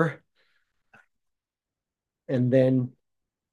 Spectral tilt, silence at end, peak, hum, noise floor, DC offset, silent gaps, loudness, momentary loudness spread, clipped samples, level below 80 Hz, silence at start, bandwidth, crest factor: -9.5 dB/octave; 0.65 s; -8 dBFS; none; -90 dBFS; under 0.1%; none; -25 LUFS; 15 LU; under 0.1%; -76 dBFS; 0 s; 7 kHz; 20 dB